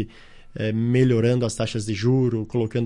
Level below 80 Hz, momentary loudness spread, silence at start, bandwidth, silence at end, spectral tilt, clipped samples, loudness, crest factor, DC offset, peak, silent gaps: -48 dBFS; 10 LU; 0 s; 11 kHz; 0 s; -7 dB/octave; under 0.1%; -22 LUFS; 16 dB; under 0.1%; -6 dBFS; none